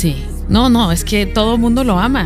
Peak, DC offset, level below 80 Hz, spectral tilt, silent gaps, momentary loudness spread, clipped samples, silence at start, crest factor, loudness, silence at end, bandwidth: 0 dBFS; under 0.1%; -22 dBFS; -5.5 dB/octave; none; 5 LU; under 0.1%; 0 s; 14 dB; -14 LUFS; 0 s; 16 kHz